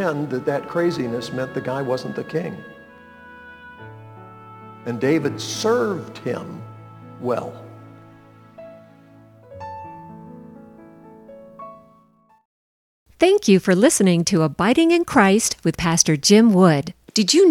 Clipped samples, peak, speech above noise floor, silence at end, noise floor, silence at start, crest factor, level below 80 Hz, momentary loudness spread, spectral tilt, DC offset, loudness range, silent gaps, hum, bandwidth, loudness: under 0.1%; 0 dBFS; 38 dB; 0 s; -56 dBFS; 0 s; 20 dB; -54 dBFS; 25 LU; -4.5 dB/octave; under 0.1%; 24 LU; 12.45-13.06 s; none; 18.5 kHz; -19 LUFS